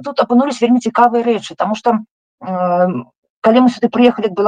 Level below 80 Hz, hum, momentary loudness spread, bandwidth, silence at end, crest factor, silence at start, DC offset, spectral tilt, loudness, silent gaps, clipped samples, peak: -60 dBFS; none; 8 LU; 9.2 kHz; 0 s; 14 dB; 0 s; under 0.1%; -6 dB/octave; -14 LUFS; 2.11-2.38 s, 3.17-3.23 s, 3.30-3.42 s; under 0.1%; 0 dBFS